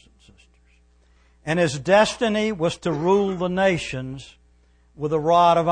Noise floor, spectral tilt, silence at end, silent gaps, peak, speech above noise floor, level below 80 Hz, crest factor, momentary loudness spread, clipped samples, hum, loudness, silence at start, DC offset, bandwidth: -57 dBFS; -5.5 dB/octave; 0 s; none; -6 dBFS; 37 dB; -52 dBFS; 16 dB; 15 LU; under 0.1%; 60 Hz at -50 dBFS; -21 LUFS; 1.45 s; under 0.1%; 9.8 kHz